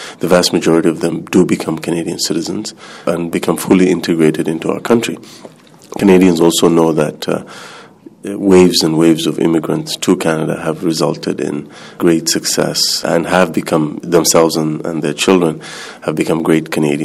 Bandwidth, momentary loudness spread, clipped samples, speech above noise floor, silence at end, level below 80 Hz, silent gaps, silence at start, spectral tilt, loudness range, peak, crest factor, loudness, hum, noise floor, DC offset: 15.5 kHz; 12 LU; under 0.1%; 24 dB; 0 s; -50 dBFS; none; 0 s; -4.5 dB/octave; 3 LU; 0 dBFS; 14 dB; -13 LUFS; none; -37 dBFS; under 0.1%